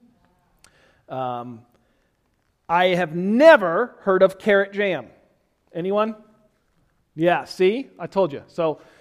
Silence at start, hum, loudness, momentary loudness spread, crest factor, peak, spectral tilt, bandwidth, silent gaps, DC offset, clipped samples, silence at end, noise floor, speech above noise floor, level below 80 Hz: 1.1 s; none; -20 LUFS; 16 LU; 22 dB; 0 dBFS; -6.5 dB/octave; 12.5 kHz; none; under 0.1%; under 0.1%; 0.25 s; -68 dBFS; 48 dB; -64 dBFS